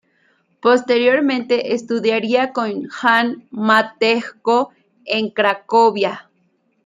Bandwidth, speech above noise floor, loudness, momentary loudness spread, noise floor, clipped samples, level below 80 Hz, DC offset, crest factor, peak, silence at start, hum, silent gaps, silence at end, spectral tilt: 10 kHz; 46 dB; -17 LUFS; 8 LU; -63 dBFS; under 0.1%; -70 dBFS; under 0.1%; 16 dB; -2 dBFS; 0.65 s; none; none; 0.65 s; -4.5 dB/octave